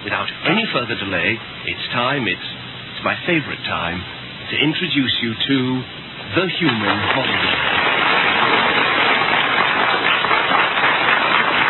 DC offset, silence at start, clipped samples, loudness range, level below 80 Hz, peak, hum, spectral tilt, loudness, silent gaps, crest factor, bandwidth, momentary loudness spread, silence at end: under 0.1%; 0 s; under 0.1%; 6 LU; -52 dBFS; -2 dBFS; none; -7 dB/octave; -17 LUFS; none; 16 dB; 4.3 kHz; 10 LU; 0 s